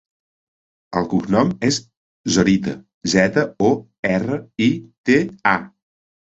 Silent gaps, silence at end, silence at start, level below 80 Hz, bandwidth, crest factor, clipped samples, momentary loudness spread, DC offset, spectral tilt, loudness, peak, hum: 1.97-2.24 s, 2.94-3.01 s, 3.99-4.03 s, 4.98-5.04 s; 0.65 s; 0.9 s; -50 dBFS; 8.2 kHz; 18 dB; under 0.1%; 9 LU; under 0.1%; -5 dB/octave; -19 LUFS; -2 dBFS; none